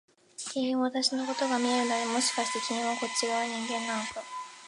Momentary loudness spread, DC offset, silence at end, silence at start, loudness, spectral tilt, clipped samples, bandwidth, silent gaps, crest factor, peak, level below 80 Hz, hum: 9 LU; under 0.1%; 0 s; 0.4 s; -29 LUFS; -1.5 dB/octave; under 0.1%; 11.5 kHz; none; 18 dB; -14 dBFS; -76 dBFS; none